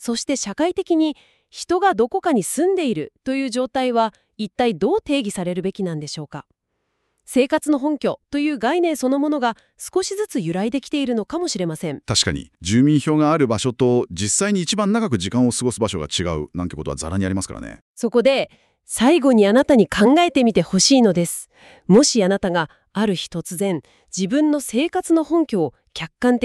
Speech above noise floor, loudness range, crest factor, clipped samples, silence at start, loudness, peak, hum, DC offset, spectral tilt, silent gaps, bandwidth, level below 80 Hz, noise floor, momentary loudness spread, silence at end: 53 dB; 7 LU; 16 dB; under 0.1%; 0 s; -19 LUFS; -2 dBFS; none; under 0.1%; -4.5 dB/octave; 17.81-17.95 s; 13.5 kHz; -48 dBFS; -73 dBFS; 13 LU; 0 s